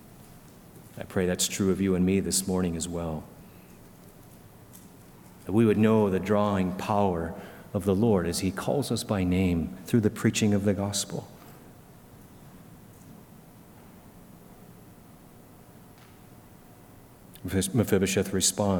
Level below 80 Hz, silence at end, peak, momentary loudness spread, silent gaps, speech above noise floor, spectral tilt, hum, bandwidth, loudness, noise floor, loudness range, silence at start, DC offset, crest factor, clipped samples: -54 dBFS; 0 s; -8 dBFS; 15 LU; none; 26 dB; -5 dB/octave; none; 19 kHz; -26 LUFS; -51 dBFS; 9 LU; 0.2 s; under 0.1%; 20 dB; under 0.1%